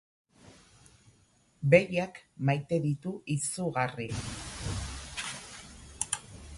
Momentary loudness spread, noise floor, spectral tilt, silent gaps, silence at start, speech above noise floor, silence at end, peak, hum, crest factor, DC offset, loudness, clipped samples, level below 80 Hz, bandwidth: 15 LU; -65 dBFS; -5 dB/octave; none; 0.45 s; 36 dB; 0 s; -8 dBFS; none; 26 dB; under 0.1%; -31 LUFS; under 0.1%; -52 dBFS; 11.5 kHz